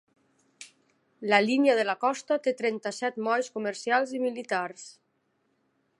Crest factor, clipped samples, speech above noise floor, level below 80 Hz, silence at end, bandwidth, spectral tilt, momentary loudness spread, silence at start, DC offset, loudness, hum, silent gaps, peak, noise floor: 24 dB; under 0.1%; 47 dB; -86 dBFS; 1.1 s; 11.5 kHz; -4 dB/octave; 24 LU; 0.6 s; under 0.1%; -27 LUFS; none; none; -6 dBFS; -74 dBFS